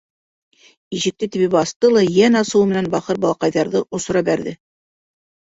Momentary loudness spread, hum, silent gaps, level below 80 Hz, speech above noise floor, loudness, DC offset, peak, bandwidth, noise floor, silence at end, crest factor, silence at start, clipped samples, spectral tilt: 9 LU; none; 1.76-1.80 s; -56 dBFS; over 73 dB; -17 LUFS; under 0.1%; -2 dBFS; 8 kHz; under -90 dBFS; 0.95 s; 16 dB; 0.9 s; under 0.1%; -5 dB/octave